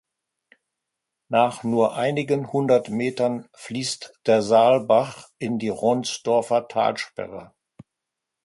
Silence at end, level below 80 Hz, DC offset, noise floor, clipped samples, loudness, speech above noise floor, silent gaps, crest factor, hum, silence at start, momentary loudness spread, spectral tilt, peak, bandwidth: 1 s; -66 dBFS; under 0.1%; -84 dBFS; under 0.1%; -22 LUFS; 62 dB; none; 18 dB; none; 1.3 s; 15 LU; -5 dB/octave; -4 dBFS; 11.5 kHz